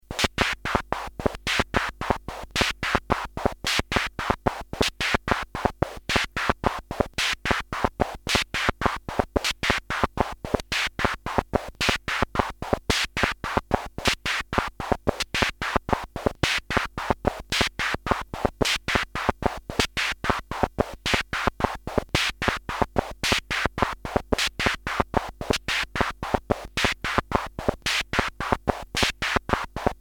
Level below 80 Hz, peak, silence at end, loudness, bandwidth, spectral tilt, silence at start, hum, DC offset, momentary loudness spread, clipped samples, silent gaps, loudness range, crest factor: -38 dBFS; 0 dBFS; 0.05 s; -26 LUFS; 19.5 kHz; -3.5 dB/octave; 0.1 s; none; under 0.1%; 5 LU; under 0.1%; none; 1 LU; 26 dB